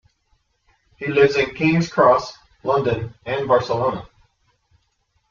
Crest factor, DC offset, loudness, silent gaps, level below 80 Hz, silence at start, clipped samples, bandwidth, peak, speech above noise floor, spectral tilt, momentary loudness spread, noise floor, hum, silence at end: 18 dB; under 0.1%; -19 LUFS; none; -52 dBFS; 1 s; under 0.1%; 7.4 kHz; -2 dBFS; 49 dB; -6.5 dB/octave; 13 LU; -67 dBFS; none; 1.25 s